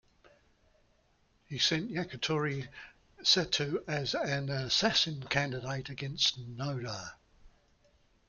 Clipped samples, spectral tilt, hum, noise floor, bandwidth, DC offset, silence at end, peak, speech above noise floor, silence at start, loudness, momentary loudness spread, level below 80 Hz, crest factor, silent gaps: under 0.1%; -3.5 dB/octave; none; -70 dBFS; 7.4 kHz; under 0.1%; 0.8 s; -12 dBFS; 37 dB; 1.5 s; -31 LUFS; 13 LU; -62 dBFS; 22 dB; none